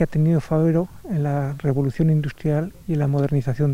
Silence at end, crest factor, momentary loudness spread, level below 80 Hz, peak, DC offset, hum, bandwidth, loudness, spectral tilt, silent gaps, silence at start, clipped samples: 0 s; 14 dB; 5 LU; -44 dBFS; -6 dBFS; under 0.1%; none; 8.4 kHz; -22 LUFS; -9.5 dB/octave; none; 0 s; under 0.1%